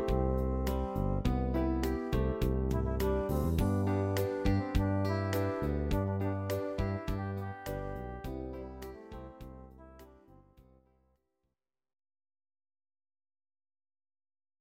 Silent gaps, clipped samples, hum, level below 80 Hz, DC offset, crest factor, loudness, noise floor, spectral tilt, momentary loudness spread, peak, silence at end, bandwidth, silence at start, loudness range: none; under 0.1%; none; -40 dBFS; under 0.1%; 18 dB; -34 LUFS; -85 dBFS; -7.5 dB/octave; 15 LU; -16 dBFS; 4 s; 16.5 kHz; 0 s; 15 LU